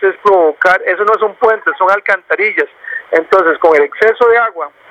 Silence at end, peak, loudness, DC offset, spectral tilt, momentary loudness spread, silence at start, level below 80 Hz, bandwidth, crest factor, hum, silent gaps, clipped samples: 0.2 s; 0 dBFS; -11 LUFS; under 0.1%; -4.5 dB/octave; 6 LU; 0 s; -56 dBFS; 8 kHz; 12 dB; none; none; 0.2%